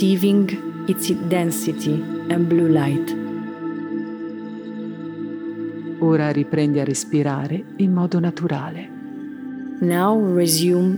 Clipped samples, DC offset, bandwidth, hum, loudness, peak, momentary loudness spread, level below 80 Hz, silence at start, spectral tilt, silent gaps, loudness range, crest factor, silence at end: under 0.1%; under 0.1%; over 20 kHz; none; -21 LUFS; -2 dBFS; 14 LU; -70 dBFS; 0 s; -6 dB/octave; none; 4 LU; 18 dB; 0 s